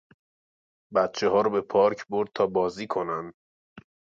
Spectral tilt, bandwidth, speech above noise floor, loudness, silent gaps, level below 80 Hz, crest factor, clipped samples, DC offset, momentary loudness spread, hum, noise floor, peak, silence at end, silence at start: -5.5 dB/octave; 7.6 kHz; over 65 dB; -26 LUFS; 3.34-3.76 s; -66 dBFS; 18 dB; under 0.1%; under 0.1%; 8 LU; none; under -90 dBFS; -8 dBFS; 0.35 s; 0.9 s